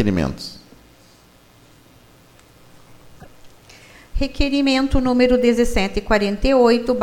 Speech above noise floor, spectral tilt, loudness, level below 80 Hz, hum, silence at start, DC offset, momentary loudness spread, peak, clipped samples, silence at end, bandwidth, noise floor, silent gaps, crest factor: 33 dB; -5.5 dB/octave; -18 LUFS; -30 dBFS; none; 0 s; under 0.1%; 12 LU; -2 dBFS; under 0.1%; 0 s; 16 kHz; -50 dBFS; none; 18 dB